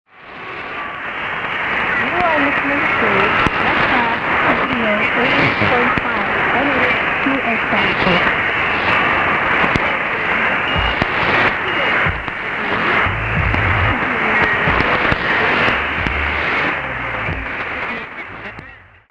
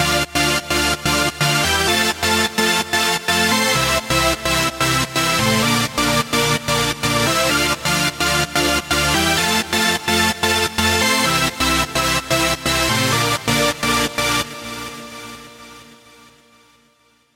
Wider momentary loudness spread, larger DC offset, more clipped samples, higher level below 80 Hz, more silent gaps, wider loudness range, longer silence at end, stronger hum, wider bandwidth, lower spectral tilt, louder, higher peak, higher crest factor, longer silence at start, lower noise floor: first, 9 LU vs 3 LU; neither; neither; about the same, -34 dBFS vs -38 dBFS; neither; about the same, 2 LU vs 4 LU; second, 0.3 s vs 1.4 s; neither; second, 10 kHz vs 16.5 kHz; first, -6 dB/octave vs -2.5 dB/octave; about the same, -15 LUFS vs -16 LUFS; about the same, 0 dBFS vs -2 dBFS; about the same, 16 dB vs 16 dB; first, 0.2 s vs 0 s; second, -40 dBFS vs -58 dBFS